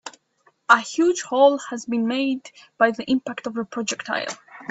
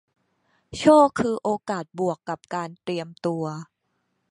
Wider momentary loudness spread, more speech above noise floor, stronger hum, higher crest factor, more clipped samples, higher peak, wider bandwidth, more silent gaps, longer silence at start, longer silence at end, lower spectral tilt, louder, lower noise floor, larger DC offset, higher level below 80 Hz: second, 13 LU vs 16 LU; second, 41 dB vs 51 dB; neither; about the same, 22 dB vs 22 dB; neither; first, 0 dBFS vs -4 dBFS; second, 8.2 kHz vs 11.5 kHz; neither; second, 0.05 s vs 0.7 s; second, 0.05 s vs 0.65 s; second, -3 dB/octave vs -6 dB/octave; about the same, -22 LUFS vs -23 LUFS; second, -63 dBFS vs -74 dBFS; neither; second, -68 dBFS vs -60 dBFS